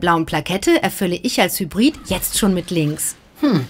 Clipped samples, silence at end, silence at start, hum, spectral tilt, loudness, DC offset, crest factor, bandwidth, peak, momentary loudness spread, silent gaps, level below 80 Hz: under 0.1%; 0 s; 0 s; none; -4 dB/octave; -18 LUFS; under 0.1%; 16 dB; 16.5 kHz; -2 dBFS; 5 LU; none; -42 dBFS